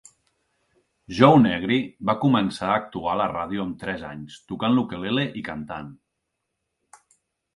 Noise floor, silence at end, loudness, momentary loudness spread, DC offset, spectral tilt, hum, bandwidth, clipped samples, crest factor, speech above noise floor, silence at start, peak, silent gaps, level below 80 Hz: -79 dBFS; 1.6 s; -23 LUFS; 18 LU; under 0.1%; -7 dB/octave; none; 11.5 kHz; under 0.1%; 24 dB; 57 dB; 1.1 s; -2 dBFS; none; -56 dBFS